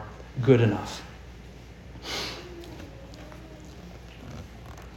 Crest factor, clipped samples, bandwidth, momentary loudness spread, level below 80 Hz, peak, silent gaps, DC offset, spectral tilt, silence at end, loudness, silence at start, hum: 26 dB; under 0.1%; 16.5 kHz; 24 LU; -48 dBFS; -6 dBFS; none; under 0.1%; -6.5 dB/octave; 0 s; -27 LUFS; 0 s; none